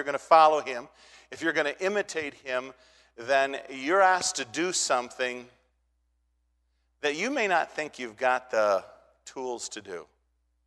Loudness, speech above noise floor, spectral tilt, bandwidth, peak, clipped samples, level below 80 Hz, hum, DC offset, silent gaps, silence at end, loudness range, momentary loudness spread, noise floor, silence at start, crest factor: -27 LUFS; 46 dB; -2 dB/octave; 12 kHz; -6 dBFS; under 0.1%; -72 dBFS; none; under 0.1%; none; 0.65 s; 4 LU; 17 LU; -73 dBFS; 0 s; 24 dB